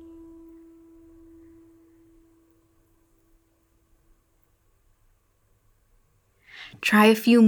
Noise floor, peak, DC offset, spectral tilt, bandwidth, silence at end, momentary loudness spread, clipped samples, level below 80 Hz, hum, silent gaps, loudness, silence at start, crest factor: -66 dBFS; -4 dBFS; under 0.1%; -5 dB/octave; over 20 kHz; 0 s; 31 LU; under 0.1%; -64 dBFS; none; none; -19 LUFS; 6.6 s; 24 dB